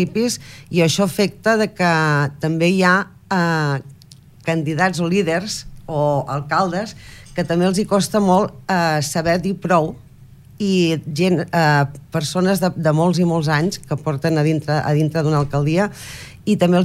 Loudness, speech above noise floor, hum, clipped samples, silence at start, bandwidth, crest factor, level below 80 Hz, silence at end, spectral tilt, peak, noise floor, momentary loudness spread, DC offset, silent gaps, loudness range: -18 LUFS; 27 dB; none; under 0.1%; 0 s; 15.5 kHz; 16 dB; -48 dBFS; 0 s; -5.5 dB/octave; -2 dBFS; -44 dBFS; 9 LU; under 0.1%; none; 3 LU